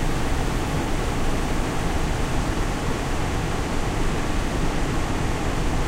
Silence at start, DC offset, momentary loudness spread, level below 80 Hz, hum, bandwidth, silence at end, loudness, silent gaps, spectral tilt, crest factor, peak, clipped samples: 0 s; under 0.1%; 1 LU; -26 dBFS; none; 15.5 kHz; 0 s; -26 LUFS; none; -5 dB/octave; 14 dB; -10 dBFS; under 0.1%